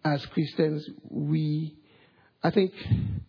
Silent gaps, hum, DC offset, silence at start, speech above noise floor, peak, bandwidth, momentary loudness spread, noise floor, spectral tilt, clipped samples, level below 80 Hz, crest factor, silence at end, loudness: none; none; under 0.1%; 0.05 s; 33 dB; -10 dBFS; 5.4 kHz; 9 LU; -60 dBFS; -9.5 dB/octave; under 0.1%; -50 dBFS; 18 dB; 0.05 s; -28 LUFS